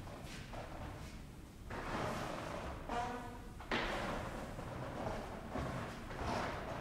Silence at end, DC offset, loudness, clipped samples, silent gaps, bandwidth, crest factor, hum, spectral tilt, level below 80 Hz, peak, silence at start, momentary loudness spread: 0 s; under 0.1%; -44 LUFS; under 0.1%; none; 16 kHz; 18 dB; none; -5 dB/octave; -52 dBFS; -24 dBFS; 0 s; 10 LU